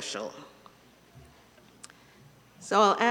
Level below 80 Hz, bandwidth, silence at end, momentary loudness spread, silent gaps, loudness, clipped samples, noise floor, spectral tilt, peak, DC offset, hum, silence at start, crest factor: -70 dBFS; 18 kHz; 0 s; 28 LU; none; -26 LUFS; under 0.1%; -57 dBFS; -3 dB/octave; -8 dBFS; under 0.1%; none; 0 s; 22 dB